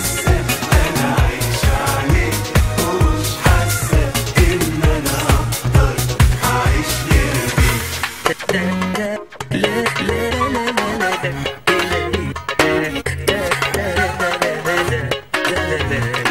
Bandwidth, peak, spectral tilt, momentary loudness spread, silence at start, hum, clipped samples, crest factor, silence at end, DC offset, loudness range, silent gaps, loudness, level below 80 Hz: 16.5 kHz; 0 dBFS; -4.5 dB/octave; 4 LU; 0 s; none; under 0.1%; 16 dB; 0 s; 0.4%; 3 LU; none; -17 LUFS; -22 dBFS